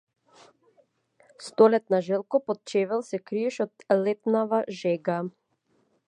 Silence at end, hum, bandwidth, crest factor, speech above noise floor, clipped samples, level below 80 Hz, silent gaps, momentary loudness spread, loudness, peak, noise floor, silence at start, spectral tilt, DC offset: 0.8 s; none; 10.5 kHz; 22 dB; 45 dB; under 0.1%; -82 dBFS; none; 12 LU; -26 LUFS; -6 dBFS; -70 dBFS; 1.4 s; -6.5 dB/octave; under 0.1%